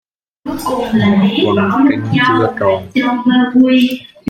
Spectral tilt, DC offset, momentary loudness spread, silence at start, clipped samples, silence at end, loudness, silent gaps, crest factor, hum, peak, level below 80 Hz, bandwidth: -6.5 dB/octave; under 0.1%; 8 LU; 0.45 s; under 0.1%; 0 s; -13 LUFS; none; 12 dB; none; 0 dBFS; -48 dBFS; 14.5 kHz